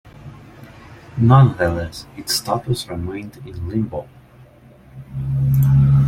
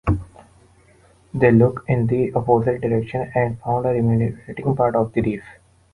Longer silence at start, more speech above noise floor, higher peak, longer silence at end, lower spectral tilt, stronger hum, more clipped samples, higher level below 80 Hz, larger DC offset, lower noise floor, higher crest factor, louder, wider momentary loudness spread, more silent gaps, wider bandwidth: about the same, 0.05 s vs 0.05 s; second, 28 dB vs 34 dB; about the same, -2 dBFS vs -2 dBFS; second, 0 s vs 0.4 s; second, -6.5 dB/octave vs -10 dB/octave; neither; neither; about the same, -38 dBFS vs -40 dBFS; neither; second, -46 dBFS vs -53 dBFS; about the same, 18 dB vs 18 dB; about the same, -18 LUFS vs -20 LUFS; first, 20 LU vs 9 LU; neither; first, 16.5 kHz vs 11 kHz